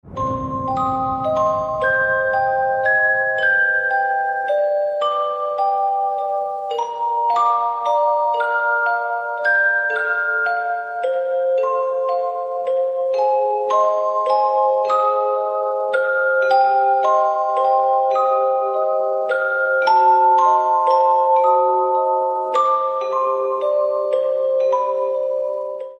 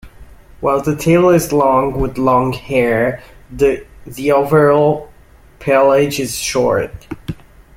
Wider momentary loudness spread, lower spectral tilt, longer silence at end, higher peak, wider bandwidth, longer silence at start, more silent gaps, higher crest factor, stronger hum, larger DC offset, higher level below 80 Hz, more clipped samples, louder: second, 7 LU vs 17 LU; about the same, -5 dB/octave vs -5.5 dB/octave; second, 0.05 s vs 0.45 s; about the same, -4 dBFS vs -2 dBFS; second, 8 kHz vs 16.5 kHz; about the same, 0.05 s vs 0.05 s; neither; about the same, 14 dB vs 14 dB; neither; neither; second, -56 dBFS vs -38 dBFS; neither; second, -18 LUFS vs -14 LUFS